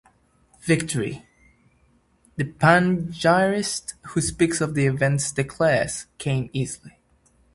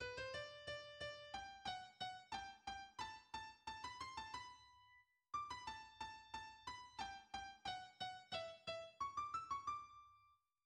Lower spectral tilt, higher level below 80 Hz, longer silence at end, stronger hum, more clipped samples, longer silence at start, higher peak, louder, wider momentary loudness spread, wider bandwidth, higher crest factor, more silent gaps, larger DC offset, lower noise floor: first, -5 dB/octave vs -2.5 dB/octave; first, -50 dBFS vs -74 dBFS; first, 0.65 s vs 0.3 s; neither; neither; first, 0.65 s vs 0 s; first, 0 dBFS vs -34 dBFS; first, -22 LUFS vs -51 LUFS; first, 12 LU vs 7 LU; about the same, 11.5 kHz vs 11.5 kHz; first, 24 dB vs 18 dB; neither; neither; second, -62 dBFS vs -76 dBFS